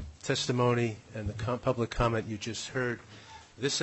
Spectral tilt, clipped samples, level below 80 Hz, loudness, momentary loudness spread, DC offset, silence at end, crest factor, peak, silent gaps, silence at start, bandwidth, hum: -4.5 dB/octave; under 0.1%; -48 dBFS; -32 LUFS; 13 LU; under 0.1%; 0 s; 18 dB; -14 dBFS; none; 0 s; 8.4 kHz; none